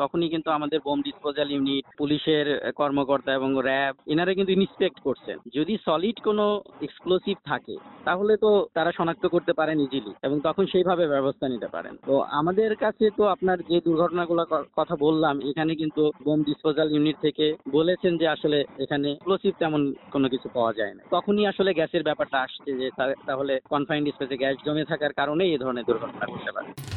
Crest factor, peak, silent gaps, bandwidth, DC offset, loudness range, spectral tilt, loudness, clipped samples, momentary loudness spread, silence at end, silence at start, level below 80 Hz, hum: 16 dB; -8 dBFS; none; 4.6 kHz; under 0.1%; 2 LU; -4 dB/octave; -25 LUFS; under 0.1%; 7 LU; 0 s; 0 s; -62 dBFS; none